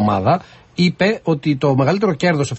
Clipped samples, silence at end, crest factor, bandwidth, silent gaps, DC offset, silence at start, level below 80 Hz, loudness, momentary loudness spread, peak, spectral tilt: under 0.1%; 0 s; 12 dB; 8.6 kHz; none; under 0.1%; 0 s; -46 dBFS; -17 LUFS; 4 LU; -4 dBFS; -6.5 dB/octave